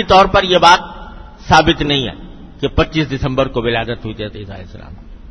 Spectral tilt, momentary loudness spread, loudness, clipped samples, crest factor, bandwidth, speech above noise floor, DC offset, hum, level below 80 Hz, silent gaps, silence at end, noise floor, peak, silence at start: -5 dB/octave; 22 LU; -13 LUFS; 0.2%; 14 dB; 11 kHz; 19 dB; under 0.1%; none; -30 dBFS; none; 0 s; -33 dBFS; 0 dBFS; 0 s